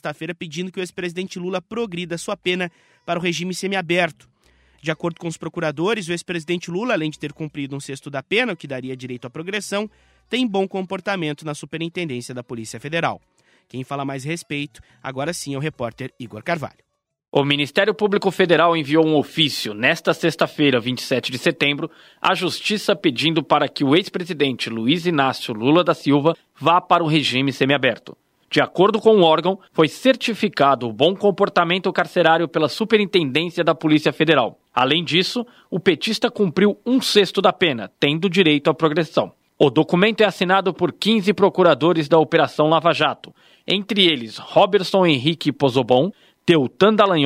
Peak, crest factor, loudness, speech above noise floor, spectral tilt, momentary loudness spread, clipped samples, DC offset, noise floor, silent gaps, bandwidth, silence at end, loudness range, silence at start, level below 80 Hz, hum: -2 dBFS; 18 dB; -19 LUFS; 38 dB; -5 dB/octave; 13 LU; under 0.1%; under 0.1%; -57 dBFS; none; 16 kHz; 0 s; 9 LU; 0.05 s; -64 dBFS; none